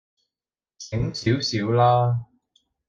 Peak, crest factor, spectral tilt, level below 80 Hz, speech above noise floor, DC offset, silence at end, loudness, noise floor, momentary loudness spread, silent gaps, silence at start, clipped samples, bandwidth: -8 dBFS; 16 dB; -6 dB/octave; -50 dBFS; over 69 dB; under 0.1%; 0.65 s; -22 LUFS; under -90 dBFS; 12 LU; none; 0.8 s; under 0.1%; 7.4 kHz